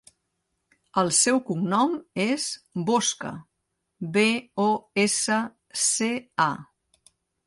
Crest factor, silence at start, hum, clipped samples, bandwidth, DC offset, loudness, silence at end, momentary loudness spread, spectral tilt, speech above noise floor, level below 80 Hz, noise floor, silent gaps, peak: 18 dB; 0.95 s; none; under 0.1%; 11.5 kHz; under 0.1%; -24 LUFS; 0.85 s; 10 LU; -3 dB/octave; 54 dB; -70 dBFS; -79 dBFS; none; -8 dBFS